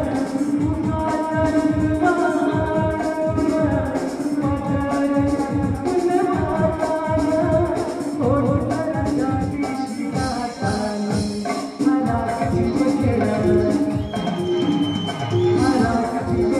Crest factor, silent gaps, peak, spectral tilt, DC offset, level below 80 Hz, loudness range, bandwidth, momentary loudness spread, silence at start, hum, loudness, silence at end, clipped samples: 14 dB; none; -6 dBFS; -7 dB/octave; under 0.1%; -38 dBFS; 2 LU; 12.5 kHz; 5 LU; 0 s; none; -21 LUFS; 0 s; under 0.1%